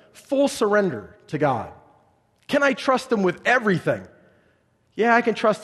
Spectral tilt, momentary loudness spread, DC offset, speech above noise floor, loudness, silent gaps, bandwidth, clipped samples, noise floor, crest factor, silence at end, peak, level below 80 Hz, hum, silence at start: -5.5 dB/octave; 11 LU; under 0.1%; 42 dB; -21 LUFS; none; 12.5 kHz; under 0.1%; -63 dBFS; 20 dB; 0 s; -4 dBFS; -64 dBFS; none; 0.3 s